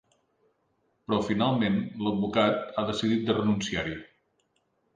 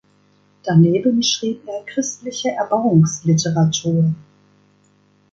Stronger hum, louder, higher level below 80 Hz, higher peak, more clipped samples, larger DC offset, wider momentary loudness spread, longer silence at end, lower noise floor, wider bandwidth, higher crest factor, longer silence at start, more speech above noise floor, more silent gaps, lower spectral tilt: second, none vs 50 Hz at -40 dBFS; second, -27 LUFS vs -18 LUFS; about the same, -58 dBFS vs -58 dBFS; second, -10 dBFS vs -2 dBFS; neither; neither; second, 7 LU vs 10 LU; second, 0.9 s vs 1.1 s; first, -73 dBFS vs -57 dBFS; first, 9.4 kHz vs 7.8 kHz; about the same, 20 dB vs 16 dB; first, 1.1 s vs 0.65 s; first, 46 dB vs 40 dB; neither; about the same, -6 dB/octave vs -5.5 dB/octave